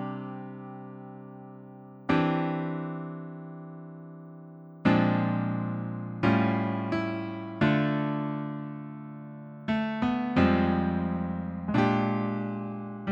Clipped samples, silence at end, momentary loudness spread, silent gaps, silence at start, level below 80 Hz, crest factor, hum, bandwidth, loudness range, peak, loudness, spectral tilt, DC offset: under 0.1%; 0 s; 20 LU; none; 0 s; -56 dBFS; 20 dB; none; 7 kHz; 5 LU; -10 dBFS; -29 LUFS; -8.5 dB/octave; under 0.1%